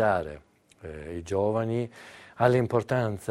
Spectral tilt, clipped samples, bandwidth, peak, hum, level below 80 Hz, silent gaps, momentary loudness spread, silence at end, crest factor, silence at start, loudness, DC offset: -7.5 dB/octave; under 0.1%; 13.5 kHz; -6 dBFS; none; -54 dBFS; none; 22 LU; 0 s; 20 dB; 0 s; -27 LUFS; under 0.1%